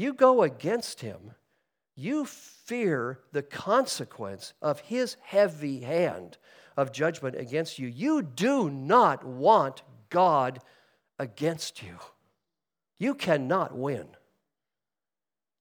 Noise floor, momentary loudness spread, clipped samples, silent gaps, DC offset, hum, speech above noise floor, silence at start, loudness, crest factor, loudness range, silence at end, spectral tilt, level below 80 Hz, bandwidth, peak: under -90 dBFS; 17 LU; under 0.1%; none; under 0.1%; none; over 63 dB; 0 s; -27 LUFS; 22 dB; 7 LU; 1.55 s; -5.5 dB/octave; -76 dBFS; over 20 kHz; -8 dBFS